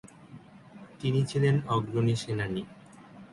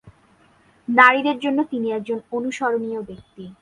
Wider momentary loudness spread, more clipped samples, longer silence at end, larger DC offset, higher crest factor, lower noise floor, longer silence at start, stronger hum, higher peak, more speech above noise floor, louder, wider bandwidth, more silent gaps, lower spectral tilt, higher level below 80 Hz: about the same, 24 LU vs 24 LU; neither; about the same, 0.05 s vs 0.1 s; neither; second, 16 dB vs 22 dB; second, -50 dBFS vs -56 dBFS; about the same, 0.05 s vs 0.05 s; neither; second, -14 dBFS vs 0 dBFS; second, 23 dB vs 36 dB; second, -29 LUFS vs -19 LUFS; about the same, 11.5 kHz vs 11 kHz; neither; first, -7 dB/octave vs -4.5 dB/octave; about the same, -60 dBFS vs -62 dBFS